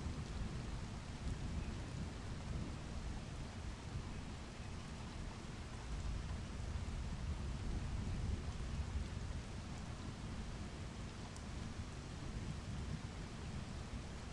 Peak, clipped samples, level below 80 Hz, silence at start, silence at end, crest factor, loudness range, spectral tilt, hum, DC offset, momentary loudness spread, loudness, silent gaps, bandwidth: -30 dBFS; under 0.1%; -48 dBFS; 0 s; 0 s; 14 dB; 3 LU; -5.5 dB/octave; none; under 0.1%; 5 LU; -47 LUFS; none; 11.5 kHz